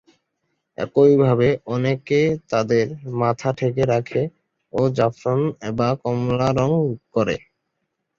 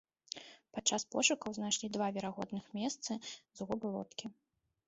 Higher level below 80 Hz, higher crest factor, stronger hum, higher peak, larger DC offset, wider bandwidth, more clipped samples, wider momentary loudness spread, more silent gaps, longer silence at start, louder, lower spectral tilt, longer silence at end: first, -52 dBFS vs -74 dBFS; second, 18 dB vs 24 dB; neither; first, -4 dBFS vs -16 dBFS; neither; about the same, 7.4 kHz vs 8 kHz; neither; second, 9 LU vs 16 LU; neither; first, 0.8 s vs 0.35 s; first, -20 LUFS vs -37 LUFS; first, -7.5 dB/octave vs -2.5 dB/octave; first, 0.8 s vs 0.55 s